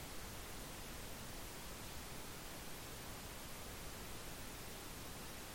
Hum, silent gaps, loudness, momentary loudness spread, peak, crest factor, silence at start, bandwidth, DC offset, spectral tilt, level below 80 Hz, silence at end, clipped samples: none; none; -50 LUFS; 0 LU; -36 dBFS; 14 dB; 0 s; 16.5 kHz; under 0.1%; -3 dB/octave; -58 dBFS; 0 s; under 0.1%